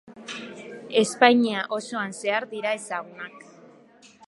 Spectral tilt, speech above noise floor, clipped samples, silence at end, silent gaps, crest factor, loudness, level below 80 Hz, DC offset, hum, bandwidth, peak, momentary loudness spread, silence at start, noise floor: -3.5 dB/octave; 29 dB; under 0.1%; 0.9 s; none; 24 dB; -24 LUFS; -80 dBFS; under 0.1%; none; 11.5 kHz; -2 dBFS; 21 LU; 0.05 s; -53 dBFS